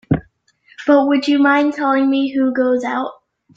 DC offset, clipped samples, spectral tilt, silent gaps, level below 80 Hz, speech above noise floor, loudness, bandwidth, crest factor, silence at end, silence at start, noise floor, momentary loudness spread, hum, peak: under 0.1%; under 0.1%; -7 dB/octave; none; -50 dBFS; 39 dB; -16 LUFS; 7.6 kHz; 14 dB; 0.45 s; 0.1 s; -54 dBFS; 9 LU; none; -2 dBFS